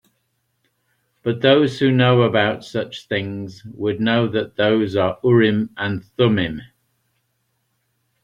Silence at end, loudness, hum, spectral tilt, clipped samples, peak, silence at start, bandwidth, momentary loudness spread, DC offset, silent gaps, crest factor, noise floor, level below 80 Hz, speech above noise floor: 1.6 s; -19 LUFS; none; -7.5 dB/octave; under 0.1%; -2 dBFS; 1.25 s; 10 kHz; 12 LU; under 0.1%; none; 18 dB; -70 dBFS; -56 dBFS; 52 dB